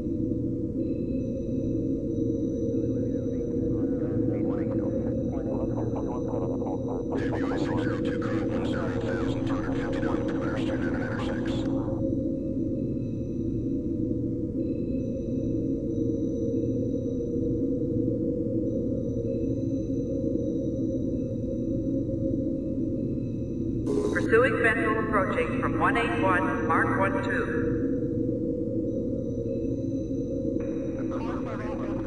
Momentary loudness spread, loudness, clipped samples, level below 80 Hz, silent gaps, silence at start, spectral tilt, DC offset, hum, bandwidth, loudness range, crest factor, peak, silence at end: 6 LU; -28 LUFS; under 0.1%; -42 dBFS; none; 0 s; -8 dB/octave; under 0.1%; none; 10.5 kHz; 4 LU; 18 dB; -10 dBFS; 0 s